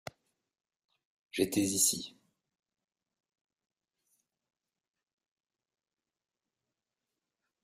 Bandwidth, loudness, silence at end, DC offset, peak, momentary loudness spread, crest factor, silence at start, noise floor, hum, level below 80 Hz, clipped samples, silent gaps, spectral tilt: 15 kHz; -30 LUFS; 5.55 s; under 0.1%; -14 dBFS; 20 LU; 26 dB; 1.35 s; under -90 dBFS; none; -76 dBFS; under 0.1%; none; -2.5 dB/octave